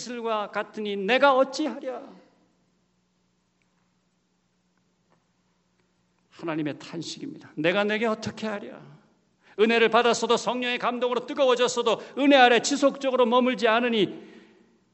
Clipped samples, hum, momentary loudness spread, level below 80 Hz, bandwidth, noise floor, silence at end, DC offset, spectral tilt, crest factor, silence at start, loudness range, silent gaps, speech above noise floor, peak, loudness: under 0.1%; 60 Hz at -70 dBFS; 16 LU; -76 dBFS; 8.2 kHz; -71 dBFS; 0.55 s; under 0.1%; -3.5 dB/octave; 24 dB; 0 s; 16 LU; none; 47 dB; -2 dBFS; -23 LUFS